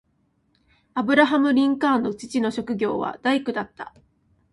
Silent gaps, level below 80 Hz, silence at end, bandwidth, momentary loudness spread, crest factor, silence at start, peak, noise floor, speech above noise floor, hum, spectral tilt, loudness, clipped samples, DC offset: none; -62 dBFS; 0.65 s; 11.5 kHz; 14 LU; 18 dB; 0.95 s; -6 dBFS; -67 dBFS; 45 dB; none; -5 dB/octave; -22 LUFS; under 0.1%; under 0.1%